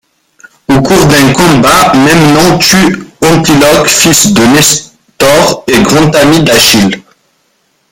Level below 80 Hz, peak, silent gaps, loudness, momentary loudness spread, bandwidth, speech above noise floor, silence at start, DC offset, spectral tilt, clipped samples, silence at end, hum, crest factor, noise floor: -32 dBFS; 0 dBFS; none; -5 LUFS; 7 LU; over 20 kHz; 50 dB; 0.7 s; under 0.1%; -3.5 dB/octave; 2%; 0.9 s; none; 6 dB; -54 dBFS